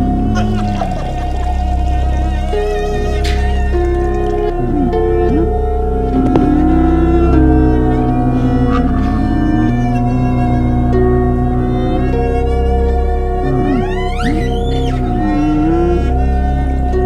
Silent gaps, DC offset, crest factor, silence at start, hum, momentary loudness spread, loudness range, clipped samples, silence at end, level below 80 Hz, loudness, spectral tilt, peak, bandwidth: none; under 0.1%; 12 dB; 0 s; none; 5 LU; 4 LU; under 0.1%; 0 s; -16 dBFS; -14 LUFS; -8.5 dB/octave; 0 dBFS; 9 kHz